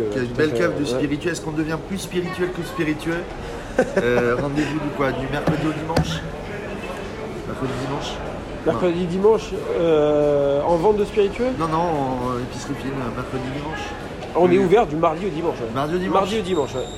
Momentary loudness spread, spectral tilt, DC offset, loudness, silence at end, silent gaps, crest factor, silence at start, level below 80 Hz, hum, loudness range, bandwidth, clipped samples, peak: 12 LU; -6 dB/octave; under 0.1%; -22 LUFS; 0 s; none; 16 dB; 0 s; -40 dBFS; none; 6 LU; 15 kHz; under 0.1%; -6 dBFS